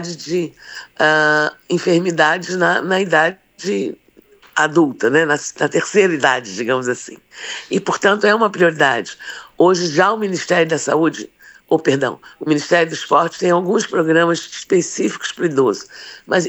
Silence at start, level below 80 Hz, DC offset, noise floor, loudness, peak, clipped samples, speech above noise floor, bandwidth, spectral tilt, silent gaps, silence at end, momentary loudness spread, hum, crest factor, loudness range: 0 s; -66 dBFS; under 0.1%; -49 dBFS; -16 LUFS; -2 dBFS; under 0.1%; 32 dB; over 20 kHz; -4 dB/octave; none; 0 s; 13 LU; none; 16 dB; 2 LU